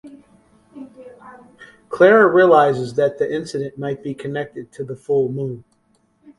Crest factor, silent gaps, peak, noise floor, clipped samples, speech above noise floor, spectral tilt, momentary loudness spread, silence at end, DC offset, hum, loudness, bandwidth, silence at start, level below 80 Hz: 20 dB; none; 0 dBFS; -62 dBFS; under 0.1%; 45 dB; -7 dB/octave; 20 LU; 0.8 s; under 0.1%; none; -17 LUFS; 11.5 kHz; 0.05 s; -62 dBFS